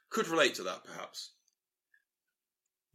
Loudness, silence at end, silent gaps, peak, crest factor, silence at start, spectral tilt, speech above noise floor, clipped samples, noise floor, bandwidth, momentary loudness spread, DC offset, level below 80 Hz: -32 LUFS; 1.65 s; none; -14 dBFS; 24 dB; 0.1 s; -2.5 dB/octave; over 56 dB; under 0.1%; under -90 dBFS; 16 kHz; 17 LU; under 0.1%; under -90 dBFS